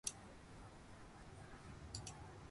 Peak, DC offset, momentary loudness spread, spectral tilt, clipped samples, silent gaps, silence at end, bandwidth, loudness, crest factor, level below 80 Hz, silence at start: -26 dBFS; under 0.1%; 8 LU; -3 dB/octave; under 0.1%; none; 0 s; 11.5 kHz; -55 LUFS; 30 dB; -64 dBFS; 0.05 s